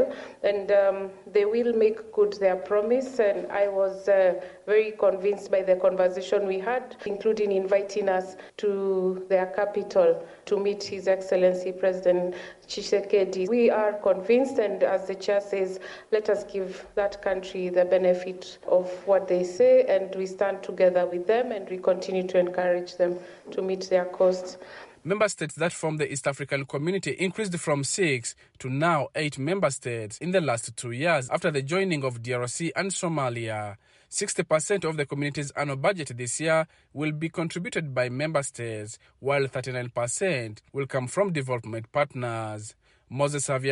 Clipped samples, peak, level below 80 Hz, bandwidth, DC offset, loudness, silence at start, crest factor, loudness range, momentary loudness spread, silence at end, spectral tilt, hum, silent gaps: under 0.1%; -10 dBFS; -66 dBFS; 11.5 kHz; under 0.1%; -26 LUFS; 0 s; 16 dB; 5 LU; 10 LU; 0 s; -5 dB/octave; none; none